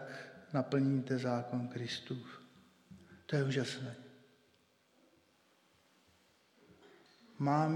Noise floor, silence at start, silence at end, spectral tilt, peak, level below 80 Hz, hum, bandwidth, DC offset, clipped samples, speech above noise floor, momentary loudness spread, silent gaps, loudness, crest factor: -72 dBFS; 0 s; 0 s; -6.5 dB/octave; -20 dBFS; -84 dBFS; none; 11 kHz; under 0.1%; under 0.1%; 37 dB; 22 LU; none; -37 LUFS; 18 dB